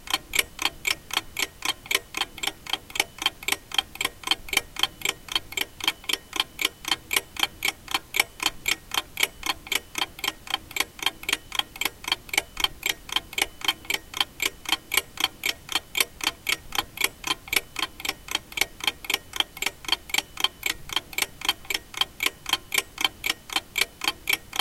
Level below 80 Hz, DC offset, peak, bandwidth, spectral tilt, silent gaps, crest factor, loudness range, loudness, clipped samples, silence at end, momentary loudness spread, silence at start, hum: -52 dBFS; under 0.1%; -2 dBFS; 17 kHz; 0.5 dB/octave; none; 28 dB; 1 LU; -26 LUFS; under 0.1%; 0 s; 5 LU; 0 s; none